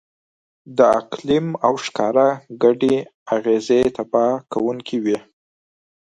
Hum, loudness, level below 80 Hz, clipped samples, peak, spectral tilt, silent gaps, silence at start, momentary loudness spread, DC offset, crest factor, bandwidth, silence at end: none; -19 LUFS; -56 dBFS; under 0.1%; 0 dBFS; -6 dB/octave; 3.14-3.26 s; 0.7 s; 7 LU; under 0.1%; 18 dB; 11 kHz; 0.9 s